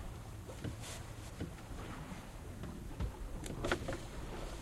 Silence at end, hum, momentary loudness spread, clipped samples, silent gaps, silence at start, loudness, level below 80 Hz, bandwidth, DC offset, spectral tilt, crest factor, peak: 0 s; none; 10 LU; under 0.1%; none; 0 s; -45 LUFS; -48 dBFS; 16 kHz; under 0.1%; -5 dB/octave; 28 dB; -16 dBFS